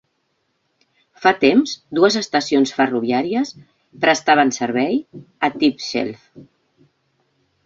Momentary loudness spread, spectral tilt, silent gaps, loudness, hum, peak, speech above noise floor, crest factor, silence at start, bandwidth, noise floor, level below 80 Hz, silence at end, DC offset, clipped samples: 9 LU; -4 dB/octave; none; -18 LUFS; none; -2 dBFS; 51 dB; 18 dB; 1.2 s; 7.8 kHz; -69 dBFS; -64 dBFS; 1.25 s; under 0.1%; under 0.1%